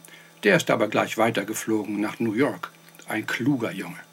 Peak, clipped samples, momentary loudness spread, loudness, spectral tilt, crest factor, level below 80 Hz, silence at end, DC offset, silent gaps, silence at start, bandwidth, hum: -6 dBFS; under 0.1%; 10 LU; -24 LUFS; -5 dB/octave; 20 dB; -76 dBFS; 0.1 s; under 0.1%; none; 0.1 s; 17 kHz; none